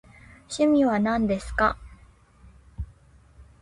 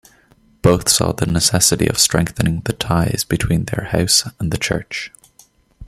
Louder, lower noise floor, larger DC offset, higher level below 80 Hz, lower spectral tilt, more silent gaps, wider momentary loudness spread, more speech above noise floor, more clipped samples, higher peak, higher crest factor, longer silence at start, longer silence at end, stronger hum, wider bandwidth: second, -23 LUFS vs -16 LUFS; about the same, -54 dBFS vs -53 dBFS; neither; second, -44 dBFS vs -38 dBFS; first, -6 dB/octave vs -3.5 dB/octave; neither; first, 20 LU vs 9 LU; second, 32 dB vs 36 dB; neither; second, -10 dBFS vs 0 dBFS; about the same, 18 dB vs 18 dB; second, 0.5 s vs 0.65 s; first, 0.2 s vs 0 s; neither; second, 11.5 kHz vs 15.5 kHz